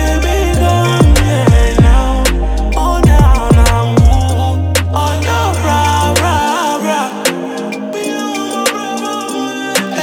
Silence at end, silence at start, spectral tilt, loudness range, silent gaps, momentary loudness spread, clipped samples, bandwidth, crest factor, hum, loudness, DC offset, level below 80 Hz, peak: 0 s; 0 s; -5 dB/octave; 5 LU; none; 9 LU; under 0.1%; 17 kHz; 10 dB; none; -12 LUFS; under 0.1%; -16 dBFS; 0 dBFS